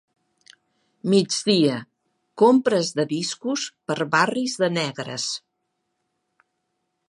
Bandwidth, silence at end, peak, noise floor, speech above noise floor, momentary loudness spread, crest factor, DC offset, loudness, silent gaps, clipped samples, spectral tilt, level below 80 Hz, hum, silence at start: 11.5 kHz; 1.7 s; -4 dBFS; -76 dBFS; 55 dB; 10 LU; 20 dB; under 0.1%; -22 LUFS; none; under 0.1%; -4.5 dB/octave; -74 dBFS; none; 1.05 s